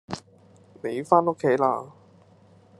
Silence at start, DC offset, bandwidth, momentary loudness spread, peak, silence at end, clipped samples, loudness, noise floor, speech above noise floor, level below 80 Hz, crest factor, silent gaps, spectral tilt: 0.1 s; under 0.1%; 12 kHz; 17 LU; -4 dBFS; 0.9 s; under 0.1%; -24 LUFS; -55 dBFS; 32 dB; -72 dBFS; 24 dB; none; -7 dB/octave